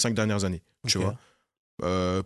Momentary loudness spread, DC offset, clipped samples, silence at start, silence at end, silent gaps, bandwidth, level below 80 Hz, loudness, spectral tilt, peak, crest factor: 8 LU; under 0.1%; under 0.1%; 0 s; 0 s; 1.57-1.77 s; 12.5 kHz; -46 dBFS; -28 LUFS; -4.5 dB/octave; -12 dBFS; 18 dB